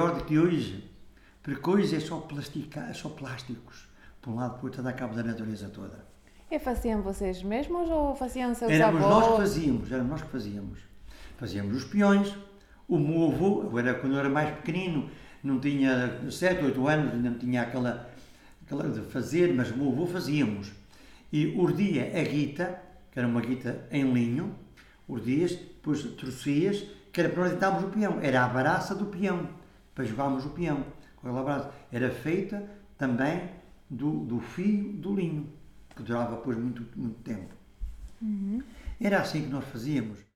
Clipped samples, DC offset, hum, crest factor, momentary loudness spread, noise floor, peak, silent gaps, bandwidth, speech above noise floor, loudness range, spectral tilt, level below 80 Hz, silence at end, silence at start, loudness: under 0.1%; under 0.1%; none; 20 dB; 14 LU; -53 dBFS; -10 dBFS; none; 15.5 kHz; 24 dB; 8 LU; -7 dB/octave; -50 dBFS; 0.15 s; 0 s; -29 LUFS